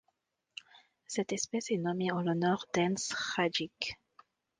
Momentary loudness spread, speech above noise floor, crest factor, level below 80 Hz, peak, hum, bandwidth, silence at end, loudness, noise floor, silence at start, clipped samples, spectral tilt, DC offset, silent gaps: 18 LU; 47 dB; 20 dB; -72 dBFS; -16 dBFS; none; 10 kHz; 0.65 s; -33 LUFS; -80 dBFS; 0.75 s; under 0.1%; -4 dB/octave; under 0.1%; none